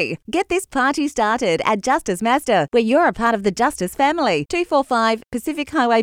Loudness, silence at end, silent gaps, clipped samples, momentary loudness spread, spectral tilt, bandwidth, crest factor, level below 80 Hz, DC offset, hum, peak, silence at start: -19 LUFS; 0 s; none; under 0.1%; 5 LU; -4 dB/octave; 16.5 kHz; 14 dB; -48 dBFS; under 0.1%; none; -4 dBFS; 0 s